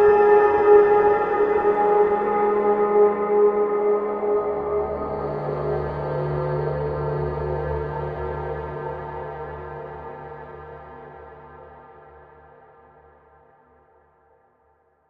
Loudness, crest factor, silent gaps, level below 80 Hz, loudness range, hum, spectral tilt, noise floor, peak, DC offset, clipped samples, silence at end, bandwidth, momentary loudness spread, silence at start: -21 LUFS; 18 dB; none; -44 dBFS; 21 LU; none; -9.5 dB/octave; -63 dBFS; -4 dBFS; under 0.1%; under 0.1%; 3.2 s; 4.6 kHz; 21 LU; 0 s